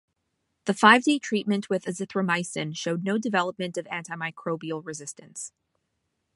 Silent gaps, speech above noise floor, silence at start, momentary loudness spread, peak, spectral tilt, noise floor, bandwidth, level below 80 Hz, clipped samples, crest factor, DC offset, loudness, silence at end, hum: none; 52 dB; 0.65 s; 19 LU; -2 dBFS; -4 dB/octave; -78 dBFS; 11.5 kHz; -76 dBFS; under 0.1%; 24 dB; under 0.1%; -25 LUFS; 0.9 s; none